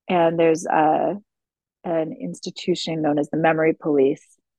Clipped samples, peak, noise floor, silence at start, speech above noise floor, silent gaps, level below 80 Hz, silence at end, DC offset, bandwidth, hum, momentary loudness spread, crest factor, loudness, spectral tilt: under 0.1%; -4 dBFS; -88 dBFS; 0.1 s; 67 dB; none; -70 dBFS; 0.4 s; under 0.1%; 10.5 kHz; none; 13 LU; 16 dB; -21 LUFS; -5.5 dB/octave